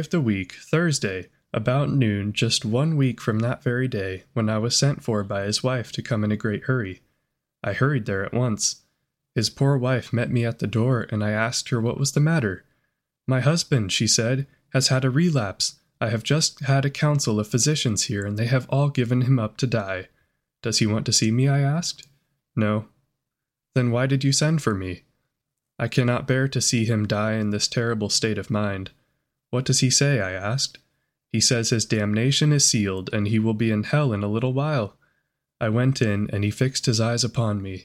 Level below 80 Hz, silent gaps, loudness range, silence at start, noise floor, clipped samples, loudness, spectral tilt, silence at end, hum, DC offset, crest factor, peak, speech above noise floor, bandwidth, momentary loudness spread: -56 dBFS; none; 3 LU; 0 s; -84 dBFS; under 0.1%; -23 LUFS; -4.5 dB/octave; 0.05 s; none; under 0.1%; 18 dB; -6 dBFS; 62 dB; 14.5 kHz; 8 LU